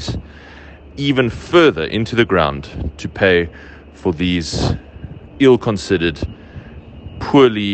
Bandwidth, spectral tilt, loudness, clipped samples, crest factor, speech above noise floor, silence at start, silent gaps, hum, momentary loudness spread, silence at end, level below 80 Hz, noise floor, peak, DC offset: 8.8 kHz; -6 dB/octave; -16 LUFS; under 0.1%; 16 dB; 23 dB; 0 s; none; none; 23 LU; 0 s; -36 dBFS; -38 dBFS; 0 dBFS; under 0.1%